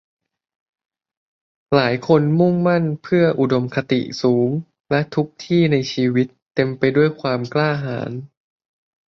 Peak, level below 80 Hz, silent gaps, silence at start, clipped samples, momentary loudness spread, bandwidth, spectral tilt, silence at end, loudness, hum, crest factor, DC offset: -2 dBFS; -58 dBFS; 4.80-4.84 s, 6.42-6.46 s; 1.7 s; under 0.1%; 7 LU; 7 kHz; -7.5 dB/octave; 0.8 s; -19 LUFS; none; 18 dB; under 0.1%